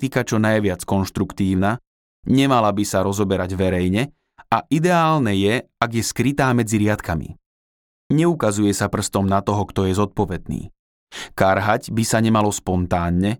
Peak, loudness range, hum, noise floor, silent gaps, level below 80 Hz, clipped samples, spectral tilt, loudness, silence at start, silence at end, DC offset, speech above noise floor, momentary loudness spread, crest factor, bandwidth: -4 dBFS; 2 LU; none; under -90 dBFS; 1.87-2.23 s, 7.46-8.10 s, 10.79-11.07 s; -44 dBFS; under 0.1%; -5.5 dB/octave; -20 LUFS; 0 s; 0.05 s; under 0.1%; over 71 dB; 8 LU; 16 dB; 18.5 kHz